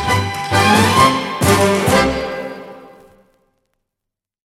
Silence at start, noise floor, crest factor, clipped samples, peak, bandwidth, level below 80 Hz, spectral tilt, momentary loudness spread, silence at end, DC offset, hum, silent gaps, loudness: 0 s; -82 dBFS; 16 dB; under 0.1%; 0 dBFS; 16.5 kHz; -38 dBFS; -4.5 dB/octave; 15 LU; 1.65 s; under 0.1%; none; none; -14 LUFS